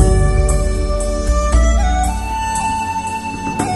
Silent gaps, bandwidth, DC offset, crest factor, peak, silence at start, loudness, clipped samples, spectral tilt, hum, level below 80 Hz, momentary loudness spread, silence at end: none; 12 kHz; 0.5%; 14 dB; 0 dBFS; 0 s; -17 LUFS; under 0.1%; -5.5 dB/octave; none; -16 dBFS; 6 LU; 0 s